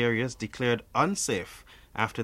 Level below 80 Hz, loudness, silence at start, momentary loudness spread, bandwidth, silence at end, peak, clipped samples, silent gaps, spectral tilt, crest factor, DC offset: -56 dBFS; -29 LUFS; 0 s; 15 LU; 16 kHz; 0 s; -8 dBFS; under 0.1%; none; -4 dB/octave; 20 dB; under 0.1%